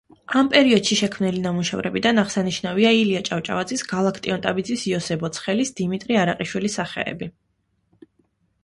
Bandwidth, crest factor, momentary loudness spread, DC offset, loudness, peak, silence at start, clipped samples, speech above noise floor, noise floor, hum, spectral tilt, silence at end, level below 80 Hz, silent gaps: 11.5 kHz; 20 dB; 9 LU; under 0.1%; -21 LUFS; -2 dBFS; 0.3 s; under 0.1%; 48 dB; -69 dBFS; none; -4.5 dB/octave; 1.35 s; -58 dBFS; none